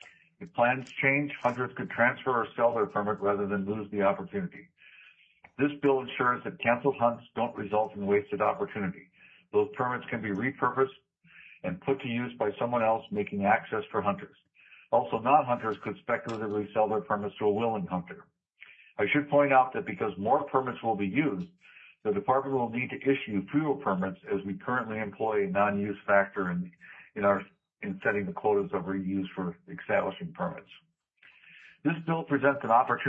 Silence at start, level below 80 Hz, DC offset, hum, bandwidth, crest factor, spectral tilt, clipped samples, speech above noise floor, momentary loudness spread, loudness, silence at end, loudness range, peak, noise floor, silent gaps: 0.4 s; -72 dBFS; under 0.1%; none; 7.8 kHz; 20 dB; -8.5 dB/octave; under 0.1%; 33 dB; 10 LU; -29 LUFS; 0 s; 4 LU; -10 dBFS; -62 dBFS; none